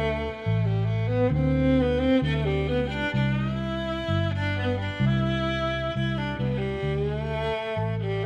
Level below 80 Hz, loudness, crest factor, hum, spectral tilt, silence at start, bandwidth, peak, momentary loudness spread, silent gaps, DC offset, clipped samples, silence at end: -38 dBFS; -26 LUFS; 12 dB; none; -8 dB/octave; 0 s; 8.6 kHz; -12 dBFS; 6 LU; none; under 0.1%; under 0.1%; 0 s